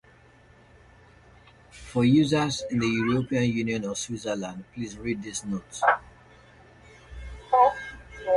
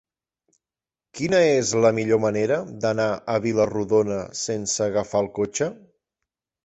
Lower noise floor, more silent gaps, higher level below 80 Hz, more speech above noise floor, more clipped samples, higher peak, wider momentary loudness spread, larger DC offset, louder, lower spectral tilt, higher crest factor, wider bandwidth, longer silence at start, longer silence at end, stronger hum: second, -55 dBFS vs under -90 dBFS; neither; first, -52 dBFS vs -58 dBFS; second, 29 dB vs over 68 dB; neither; about the same, -6 dBFS vs -6 dBFS; first, 18 LU vs 8 LU; neither; second, -26 LUFS vs -22 LUFS; about the same, -5.5 dB/octave vs -4.5 dB/octave; about the same, 22 dB vs 18 dB; first, 11.5 kHz vs 8.2 kHz; first, 1.75 s vs 1.15 s; second, 0 s vs 0.9 s; neither